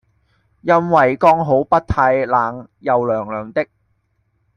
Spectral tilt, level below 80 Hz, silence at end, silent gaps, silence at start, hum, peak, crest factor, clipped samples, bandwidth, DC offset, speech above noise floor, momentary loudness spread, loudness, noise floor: -8 dB/octave; -42 dBFS; 0.95 s; none; 0.65 s; none; -2 dBFS; 16 dB; under 0.1%; 9.8 kHz; under 0.1%; 49 dB; 11 LU; -16 LUFS; -65 dBFS